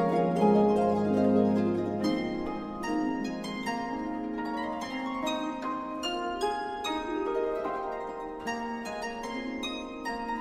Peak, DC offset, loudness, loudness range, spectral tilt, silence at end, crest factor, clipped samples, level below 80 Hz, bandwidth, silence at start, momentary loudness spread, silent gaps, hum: -12 dBFS; under 0.1%; -30 LUFS; 6 LU; -6 dB/octave; 0 s; 18 dB; under 0.1%; -56 dBFS; 14 kHz; 0 s; 11 LU; none; none